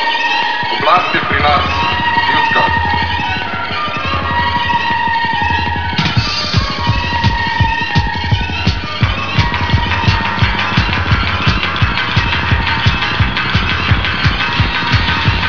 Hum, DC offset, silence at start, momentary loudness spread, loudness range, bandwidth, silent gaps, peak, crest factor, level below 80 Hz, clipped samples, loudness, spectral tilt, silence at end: none; 4%; 0 s; 4 LU; 2 LU; 5.4 kHz; none; 0 dBFS; 14 dB; -24 dBFS; under 0.1%; -13 LUFS; -5.5 dB/octave; 0 s